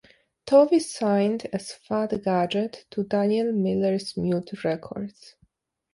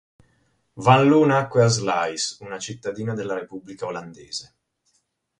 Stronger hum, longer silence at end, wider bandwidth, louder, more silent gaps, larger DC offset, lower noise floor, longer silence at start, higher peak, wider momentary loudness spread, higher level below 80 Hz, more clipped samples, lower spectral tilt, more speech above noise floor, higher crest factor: neither; about the same, 0.85 s vs 0.95 s; about the same, 11.5 kHz vs 11 kHz; second, -24 LUFS vs -21 LUFS; neither; neither; second, -66 dBFS vs -70 dBFS; second, 0.45 s vs 0.75 s; second, -6 dBFS vs 0 dBFS; second, 13 LU vs 17 LU; about the same, -62 dBFS vs -60 dBFS; neither; first, -6.5 dB/octave vs -5 dB/octave; second, 43 dB vs 49 dB; about the same, 18 dB vs 22 dB